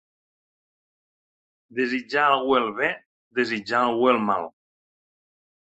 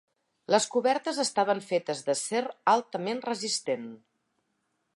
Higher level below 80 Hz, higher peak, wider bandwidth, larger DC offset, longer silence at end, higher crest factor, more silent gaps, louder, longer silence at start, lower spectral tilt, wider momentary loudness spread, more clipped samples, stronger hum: first, -68 dBFS vs -84 dBFS; first, -4 dBFS vs -8 dBFS; second, 8.2 kHz vs 11.5 kHz; neither; first, 1.3 s vs 1 s; about the same, 22 dB vs 20 dB; first, 3.06-3.31 s vs none; first, -23 LUFS vs -28 LUFS; first, 1.75 s vs 0.5 s; first, -5 dB/octave vs -3 dB/octave; first, 11 LU vs 7 LU; neither; neither